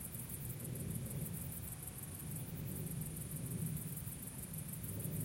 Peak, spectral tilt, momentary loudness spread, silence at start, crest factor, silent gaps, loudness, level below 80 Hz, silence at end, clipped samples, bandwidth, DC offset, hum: -28 dBFS; -5 dB/octave; 4 LU; 0 s; 16 dB; none; -44 LUFS; -60 dBFS; 0 s; under 0.1%; 17 kHz; under 0.1%; none